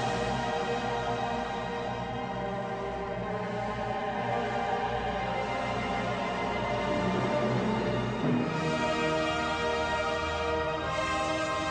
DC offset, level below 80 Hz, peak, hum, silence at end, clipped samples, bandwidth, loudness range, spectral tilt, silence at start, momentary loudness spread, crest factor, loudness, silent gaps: under 0.1%; -48 dBFS; -16 dBFS; none; 0 s; under 0.1%; 10 kHz; 4 LU; -5.5 dB/octave; 0 s; 5 LU; 14 dB; -31 LUFS; none